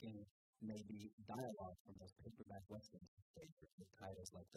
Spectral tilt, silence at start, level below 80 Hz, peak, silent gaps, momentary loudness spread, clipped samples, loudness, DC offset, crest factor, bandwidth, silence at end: -6 dB/octave; 0 s; -78 dBFS; -34 dBFS; 0.31-0.53 s, 1.13-1.18 s, 1.80-1.85 s, 3.08-3.34 s, 3.52-3.57 s, 3.72-3.78 s; 14 LU; under 0.1%; -57 LUFS; under 0.1%; 22 dB; 15 kHz; 0 s